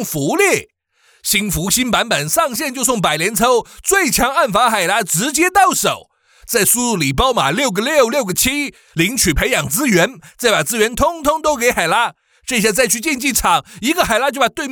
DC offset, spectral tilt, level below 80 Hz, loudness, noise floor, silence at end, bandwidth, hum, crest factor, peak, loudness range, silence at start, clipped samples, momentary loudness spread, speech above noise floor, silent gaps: under 0.1%; -2.5 dB/octave; -36 dBFS; -15 LUFS; -56 dBFS; 0 s; over 20 kHz; none; 14 dB; -2 dBFS; 2 LU; 0 s; under 0.1%; 5 LU; 40 dB; none